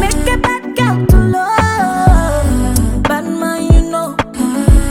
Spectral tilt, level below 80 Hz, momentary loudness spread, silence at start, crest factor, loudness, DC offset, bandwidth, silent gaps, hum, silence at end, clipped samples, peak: -6 dB/octave; -16 dBFS; 6 LU; 0 s; 12 dB; -13 LUFS; under 0.1%; 16 kHz; none; none; 0 s; under 0.1%; 0 dBFS